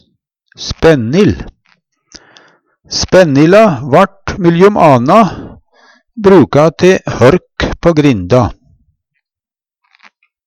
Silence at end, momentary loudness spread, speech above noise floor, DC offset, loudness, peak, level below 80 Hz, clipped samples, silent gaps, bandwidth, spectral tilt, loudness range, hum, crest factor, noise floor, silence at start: 1.95 s; 11 LU; 81 dB; under 0.1%; -9 LUFS; 0 dBFS; -34 dBFS; 0.2%; none; 12 kHz; -6.5 dB/octave; 5 LU; none; 10 dB; -89 dBFS; 0.6 s